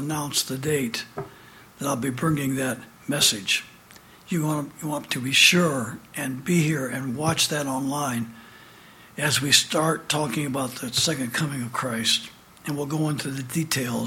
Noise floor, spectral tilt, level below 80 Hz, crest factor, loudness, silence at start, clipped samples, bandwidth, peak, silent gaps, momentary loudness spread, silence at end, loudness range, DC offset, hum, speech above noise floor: -50 dBFS; -3 dB/octave; -60 dBFS; 24 dB; -24 LUFS; 0 s; under 0.1%; 17 kHz; -2 dBFS; none; 13 LU; 0 s; 4 LU; under 0.1%; none; 25 dB